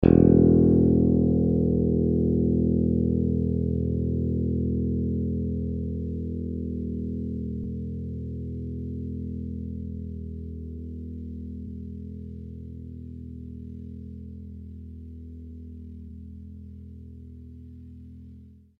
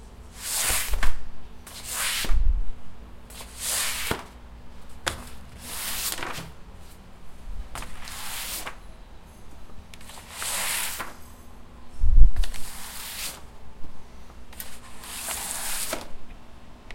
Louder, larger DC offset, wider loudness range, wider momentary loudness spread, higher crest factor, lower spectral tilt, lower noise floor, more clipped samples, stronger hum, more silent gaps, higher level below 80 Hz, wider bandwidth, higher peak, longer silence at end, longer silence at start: first, -26 LUFS vs -29 LUFS; neither; first, 19 LU vs 7 LU; about the same, 22 LU vs 23 LU; about the same, 24 dB vs 24 dB; first, -13 dB/octave vs -2 dB/octave; first, -49 dBFS vs -43 dBFS; neither; first, 60 Hz at -65 dBFS vs none; neither; second, -38 dBFS vs -28 dBFS; second, 3.3 kHz vs 16.5 kHz; second, -4 dBFS vs 0 dBFS; first, 0.25 s vs 0 s; about the same, 0 s vs 0 s